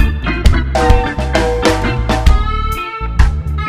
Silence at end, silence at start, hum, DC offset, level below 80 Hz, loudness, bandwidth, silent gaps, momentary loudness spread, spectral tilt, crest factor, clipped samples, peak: 0 s; 0 s; none; under 0.1%; -14 dBFS; -15 LUFS; 15 kHz; none; 5 LU; -6 dB/octave; 12 dB; 0.9%; 0 dBFS